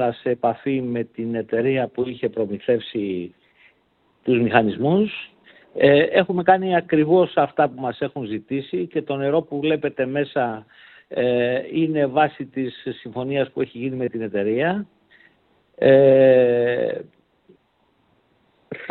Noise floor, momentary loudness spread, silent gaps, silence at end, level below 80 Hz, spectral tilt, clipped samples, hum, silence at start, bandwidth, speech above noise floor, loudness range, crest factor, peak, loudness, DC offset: -64 dBFS; 14 LU; none; 0 s; -62 dBFS; -10.5 dB/octave; under 0.1%; none; 0 s; 4.4 kHz; 44 dB; 6 LU; 20 dB; 0 dBFS; -21 LUFS; under 0.1%